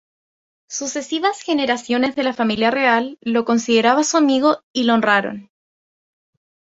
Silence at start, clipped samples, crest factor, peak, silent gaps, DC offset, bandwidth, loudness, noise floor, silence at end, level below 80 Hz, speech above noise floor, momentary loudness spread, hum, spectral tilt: 0.7 s; under 0.1%; 18 dB; -2 dBFS; 4.63-4.74 s; under 0.1%; 8 kHz; -18 LUFS; under -90 dBFS; 1.25 s; -62 dBFS; over 72 dB; 9 LU; none; -3 dB/octave